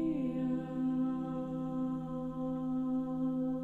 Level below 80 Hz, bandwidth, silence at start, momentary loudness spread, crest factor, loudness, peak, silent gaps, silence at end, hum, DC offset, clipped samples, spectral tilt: -58 dBFS; 4 kHz; 0 s; 4 LU; 10 dB; -36 LUFS; -24 dBFS; none; 0 s; none; under 0.1%; under 0.1%; -10 dB/octave